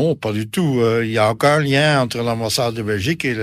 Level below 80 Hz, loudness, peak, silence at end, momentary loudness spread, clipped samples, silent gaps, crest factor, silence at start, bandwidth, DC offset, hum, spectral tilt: -52 dBFS; -18 LUFS; -2 dBFS; 0 s; 6 LU; under 0.1%; none; 16 dB; 0 s; 15.5 kHz; under 0.1%; none; -5 dB/octave